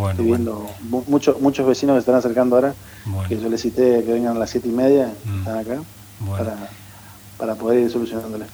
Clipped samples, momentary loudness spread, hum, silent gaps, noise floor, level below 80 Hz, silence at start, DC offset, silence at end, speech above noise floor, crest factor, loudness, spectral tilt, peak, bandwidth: under 0.1%; 13 LU; none; none; -41 dBFS; -50 dBFS; 0 s; under 0.1%; 0 s; 22 dB; 18 dB; -20 LUFS; -7 dB/octave; -2 dBFS; over 20 kHz